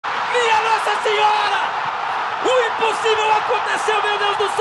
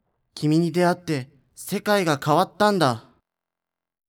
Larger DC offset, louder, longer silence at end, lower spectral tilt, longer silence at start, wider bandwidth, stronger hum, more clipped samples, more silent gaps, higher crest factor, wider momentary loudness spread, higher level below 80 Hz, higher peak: neither; first, -18 LUFS vs -22 LUFS; second, 0 s vs 1.1 s; second, -1.5 dB/octave vs -5.5 dB/octave; second, 0.05 s vs 0.35 s; second, 12 kHz vs 19 kHz; neither; neither; neither; about the same, 14 dB vs 18 dB; second, 5 LU vs 15 LU; about the same, -62 dBFS vs -66 dBFS; about the same, -4 dBFS vs -6 dBFS